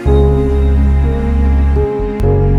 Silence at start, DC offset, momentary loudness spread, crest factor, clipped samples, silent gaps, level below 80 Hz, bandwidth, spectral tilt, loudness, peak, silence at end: 0 s; under 0.1%; 4 LU; 10 dB; under 0.1%; none; -12 dBFS; 4 kHz; -9.5 dB/octave; -13 LUFS; 0 dBFS; 0 s